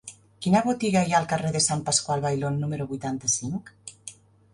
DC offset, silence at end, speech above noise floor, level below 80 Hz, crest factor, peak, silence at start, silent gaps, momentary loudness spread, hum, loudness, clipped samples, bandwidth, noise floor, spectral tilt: under 0.1%; 0.4 s; 22 dB; -60 dBFS; 18 dB; -8 dBFS; 0.05 s; none; 18 LU; none; -25 LUFS; under 0.1%; 11.5 kHz; -47 dBFS; -4 dB/octave